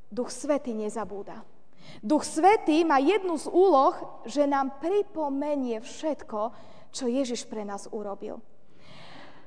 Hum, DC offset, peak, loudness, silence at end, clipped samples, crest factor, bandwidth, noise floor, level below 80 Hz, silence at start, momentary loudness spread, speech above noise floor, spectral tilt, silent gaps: none; 0.8%; -8 dBFS; -27 LUFS; 0.2 s; under 0.1%; 20 dB; 10 kHz; -53 dBFS; -68 dBFS; 0.1 s; 17 LU; 27 dB; -4 dB/octave; none